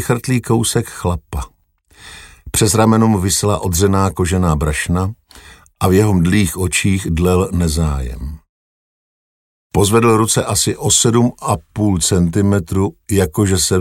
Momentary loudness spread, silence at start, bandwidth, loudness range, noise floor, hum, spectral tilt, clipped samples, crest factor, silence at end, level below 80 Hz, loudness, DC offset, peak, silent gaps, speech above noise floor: 9 LU; 0 s; 16.5 kHz; 3 LU; -48 dBFS; none; -5 dB/octave; under 0.1%; 16 dB; 0 s; -30 dBFS; -15 LUFS; under 0.1%; 0 dBFS; 8.49-9.70 s; 34 dB